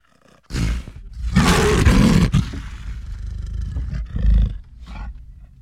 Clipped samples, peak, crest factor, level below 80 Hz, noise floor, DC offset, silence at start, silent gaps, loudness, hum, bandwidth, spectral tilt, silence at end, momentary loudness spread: under 0.1%; -2 dBFS; 16 dB; -24 dBFS; -54 dBFS; under 0.1%; 0.5 s; none; -19 LUFS; none; 15 kHz; -6 dB/octave; 0.15 s; 21 LU